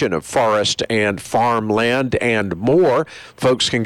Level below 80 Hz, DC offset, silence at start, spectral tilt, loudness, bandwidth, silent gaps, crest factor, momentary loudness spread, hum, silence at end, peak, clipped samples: -48 dBFS; under 0.1%; 0 s; -4.5 dB/octave; -17 LUFS; 16.5 kHz; none; 10 dB; 4 LU; none; 0 s; -8 dBFS; under 0.1%